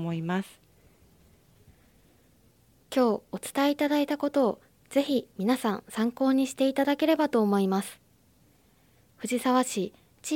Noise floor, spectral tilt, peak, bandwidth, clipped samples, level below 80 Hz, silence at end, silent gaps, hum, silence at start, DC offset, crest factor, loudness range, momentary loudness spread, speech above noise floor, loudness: -62 dBFS; -5 dB/octave; -12 dBFS; 17 kHz; under 0.1%; -68 dBFS; 0 s; none; none; 0 s; under 0.1%; 16 dB; 6 LU; 9 LU; 36 dB; -27 LUFS